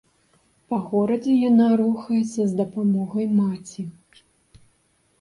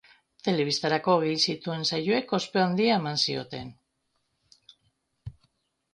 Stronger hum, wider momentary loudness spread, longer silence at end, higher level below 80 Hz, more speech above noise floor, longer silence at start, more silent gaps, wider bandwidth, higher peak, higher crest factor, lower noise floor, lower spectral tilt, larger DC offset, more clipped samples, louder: neither; second, 14 LU vs 21 LU; first, 1.3 s vs 0.65 s; about the same, -64 dBFS vs -64 dBFS; second, 44 dB vs 50 dB; first, 0.7 s vs 0.45 s; neither; about the same, 11 kHz vs 10.5 kHz; about the same, -8 dBFS vs -10 dBFS; second, 14 dB vs 20 dB; second, -65 dBFS vs -76 dBFS; first, -8 dB/octave vs -4.5 dB/octave; neither; neither; first, -21 LUFS vs -26 LUFS